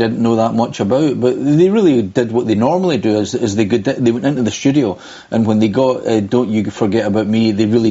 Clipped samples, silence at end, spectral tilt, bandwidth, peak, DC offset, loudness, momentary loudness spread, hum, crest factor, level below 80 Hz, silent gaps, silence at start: under 0.1%; 0 s; -6.5 dB/octave; 8 kHz; -2 dBFS; under 0.1%; -15 LUFS; 4 LU; none; 12 dB; -52 dBFS; none; 0 s